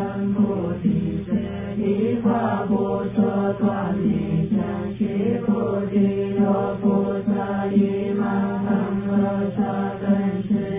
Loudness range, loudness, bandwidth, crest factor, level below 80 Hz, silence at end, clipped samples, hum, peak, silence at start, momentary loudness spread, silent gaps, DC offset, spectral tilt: 1 LU; -22 LUFS; 3.8 kHz; 14 dB; -46 dBFS; 0 s; under 0.1%; none; -8 dBFS; 0 s; 4 LU; none; under 0.1%; -12.5 dB/octave